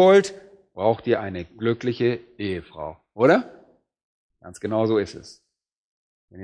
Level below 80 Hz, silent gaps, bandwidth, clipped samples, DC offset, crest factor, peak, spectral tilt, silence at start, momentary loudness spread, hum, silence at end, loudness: -60 dBFS; 4.04-4.30 s, 5.76-6.28 s; 10.5 kHz; under 0.1%; under 0.1%; 20 dB; -4 dBFS; -6 dB/octave; 0 s; 18 LU; none; 0 s; -23 LUFS